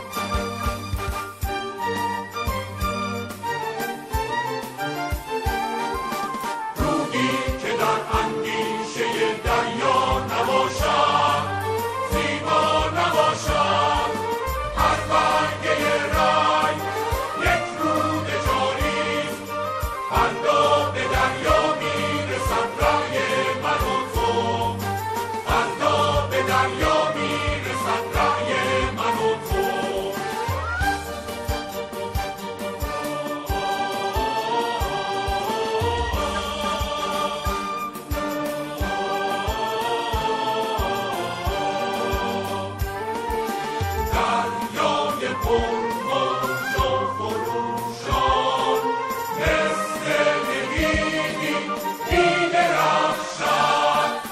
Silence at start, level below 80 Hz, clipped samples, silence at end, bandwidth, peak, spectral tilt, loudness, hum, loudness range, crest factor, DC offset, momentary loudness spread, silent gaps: 0 s; -36 dBFS; under 0.1%; 0 s; 16 kHz; -6 dBFS; -4 dB/octave; -23 LUFS; none; 6 LU; 18 dB; under 0.1%; 8 LU; none